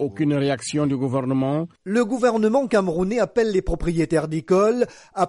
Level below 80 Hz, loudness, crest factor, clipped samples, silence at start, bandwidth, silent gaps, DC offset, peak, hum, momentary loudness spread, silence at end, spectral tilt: -40 dBFS; -21 LUFS; 14 dB; under 0.1%; 0 s; 11.5 kHz; none; under 0.1%; -6 dBFS; none; 6 LU; 0 s; -6.5 dB/octave